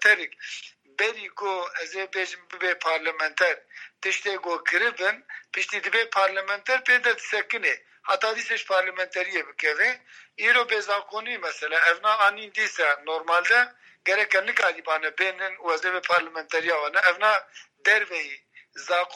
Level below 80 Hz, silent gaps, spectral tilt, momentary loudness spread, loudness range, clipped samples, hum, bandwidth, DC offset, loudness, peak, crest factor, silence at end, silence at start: under -90 dBFS; none; 0 dB/octave; 11 LU; 4 LU; under 0.1%; none; 13 kHz; under 0.1%; -24 LUFS; -4 dBFS; 20 dB; 0 s; 0 s